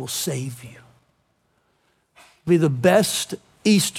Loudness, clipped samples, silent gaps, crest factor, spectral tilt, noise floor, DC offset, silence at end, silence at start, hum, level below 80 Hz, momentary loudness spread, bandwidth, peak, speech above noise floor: -20 LUFS; under 0.1%; none; 18 dB; -4.5 dB/octave; -67 dBFS; under 0.1%; 0 s; 0 s; none; -62 dBFS; 17 LU; 17 kHz; -4 dBFS; 47 dB